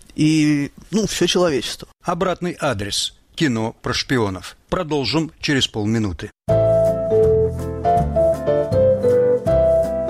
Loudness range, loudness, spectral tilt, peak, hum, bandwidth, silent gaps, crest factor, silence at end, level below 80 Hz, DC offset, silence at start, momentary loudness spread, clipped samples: 5 LU; -19 LUFS; -5 dB/octave; -6 dBFS; none; 15 kHz; none; 12 dB; 0 s; -36 dBFS; under 0.1%; 0.15 s; 8 LU; under 0.1%